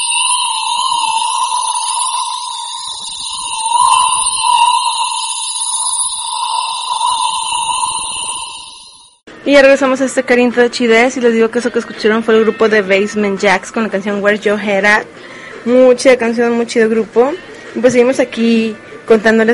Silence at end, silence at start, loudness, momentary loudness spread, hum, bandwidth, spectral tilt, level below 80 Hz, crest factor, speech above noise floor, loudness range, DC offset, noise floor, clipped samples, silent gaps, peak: 0 s; 0 s; -12 LUFS; 11 LU; none; 11.5 kHz; -2.5 dB/octave; -52 dBFS; 14 dB; 27 dB; 4 LU; under 0.1%; -38 dBFS; under 0.1%; none; 0 dBFS